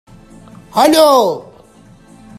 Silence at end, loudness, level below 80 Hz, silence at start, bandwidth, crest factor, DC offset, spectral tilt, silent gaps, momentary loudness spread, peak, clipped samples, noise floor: 1 s; -11 LUFS; -52 dBFS; 0.75 s; 15.5 kHz; 16 dB; under 0.1%; -3.5 dB/octave; none; 13 LU; 0 dBFS; under 0.1%; -43 dBFS